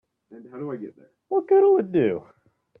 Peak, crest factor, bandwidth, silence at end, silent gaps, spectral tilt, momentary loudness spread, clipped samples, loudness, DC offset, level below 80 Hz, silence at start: -10 dBFS; 14 dB; 3.6 kHz; 0.6 s; none; -10.5 dB/octave; 20 LU; under 0.1%; -22 LUFS; under 0.1%; -70 dBFS; 0.3 s